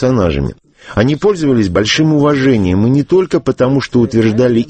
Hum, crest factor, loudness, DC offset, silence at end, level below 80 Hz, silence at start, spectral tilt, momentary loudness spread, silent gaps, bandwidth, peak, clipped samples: none; 12 dB; -12 LUFS; under 0.1%; 0 s; -34 dBFS; 0 s; -6.5 dB/octave; 4 LU; none; 8.6 kHz; 0 dBFS; under 0.1%